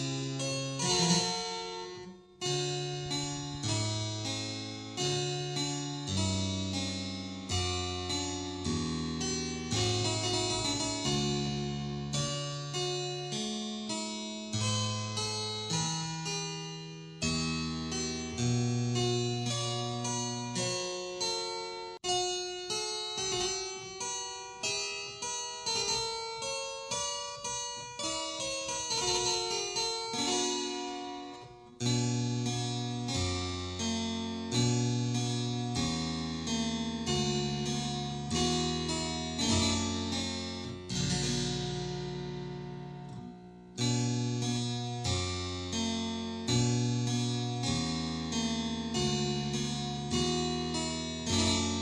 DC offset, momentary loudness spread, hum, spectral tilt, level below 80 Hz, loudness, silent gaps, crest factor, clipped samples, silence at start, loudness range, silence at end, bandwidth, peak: under 0.1%; 8 LU; none; -3.5 dB/octave; -54 dBFS; -33 LUFS; none; 20 dB; under 0.1%; 0 s; 3 LU; 0 s; 12 kHz; -14 dBFS